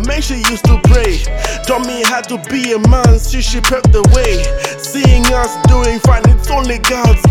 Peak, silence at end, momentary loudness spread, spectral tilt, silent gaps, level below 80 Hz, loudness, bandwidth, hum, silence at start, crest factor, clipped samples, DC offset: 0 dBFS; 0 s; 8 LU; -5 dB/octave; none; -14 dBFS; -12 LUFS; 17.5 kHz; none; 0 s; 10 dB; under 0.1%; under 0.1%